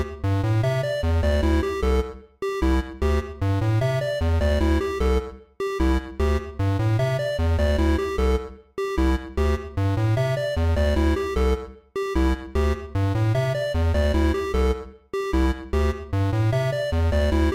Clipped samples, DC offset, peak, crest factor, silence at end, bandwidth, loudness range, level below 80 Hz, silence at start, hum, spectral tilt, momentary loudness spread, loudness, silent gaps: under 0.1%; under 0.1%; -14 dBFS; 8 dB; 0 s; 14.5 kHz; 0 LU; -26 dBFS; 0 s; none; -7 dB/octave; 5 LU; -24 LUFS; none